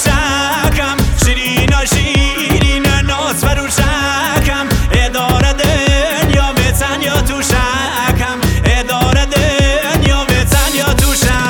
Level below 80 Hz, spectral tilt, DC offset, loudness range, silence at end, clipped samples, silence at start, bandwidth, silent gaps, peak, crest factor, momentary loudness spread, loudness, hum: -18 dBFS; -4 dB/octave; under 0.1%; 1 LU; 0 s; under 0.1%; 0 s; 19 kHz; none; 0 dBFS; 12 dB; 3 LU; -12 LUFS; none